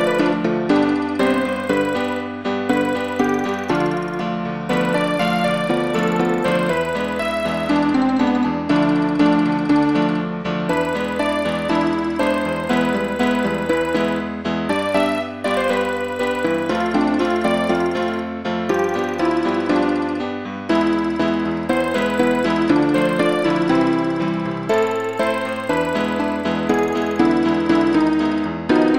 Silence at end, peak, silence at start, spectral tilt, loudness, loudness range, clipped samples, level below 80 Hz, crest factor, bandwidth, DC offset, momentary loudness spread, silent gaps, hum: 0 s; -4 dBFS; 0 s; -6 dB/octave; -19 LUFS; 2 LU; under 0.1%; -50 dBFS; 16 dB; 16 kHz; 0.3%; 5 LU; none; none